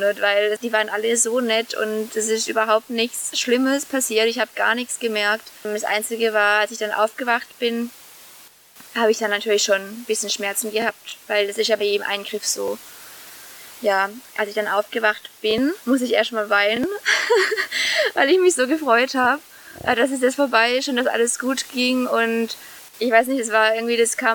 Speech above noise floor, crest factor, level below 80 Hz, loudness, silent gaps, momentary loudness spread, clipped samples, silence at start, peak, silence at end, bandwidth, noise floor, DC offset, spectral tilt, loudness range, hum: 27 dB; 18 dB; -66 dBFS; -20 LUFS; none; 8 LU; under 0.1%; 0 s; -2 dBFS; 0 s; 19 kHz; -47 dBFS; under 0.1%; -1.5 dB/octave; 5 LU; none